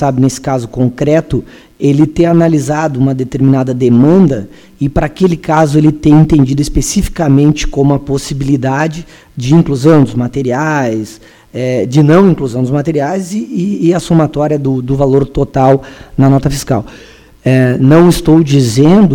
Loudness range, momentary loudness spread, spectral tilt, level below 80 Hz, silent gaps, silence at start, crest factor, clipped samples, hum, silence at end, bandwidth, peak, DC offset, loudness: 3 LU; 10 LU; -7 dB/octave; -28 dBFS; none; 0 s; 10 dB; 0.5%; none; 0 s; 16.5 kHz; 0 dBFS; under 0.1%; -11 LUFS